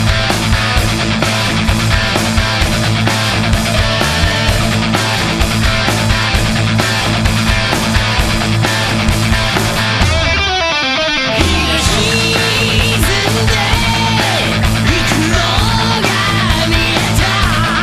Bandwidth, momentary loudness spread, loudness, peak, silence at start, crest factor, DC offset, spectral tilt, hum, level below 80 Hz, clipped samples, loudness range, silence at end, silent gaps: 14 kHz; 2 LU; -12 LUFS; 0 dBFS; 0 s; 12 dB; 0.5%; -4 dB/octave; none; -22 dBFS; under 0.1%; 1 LU; 0 s; none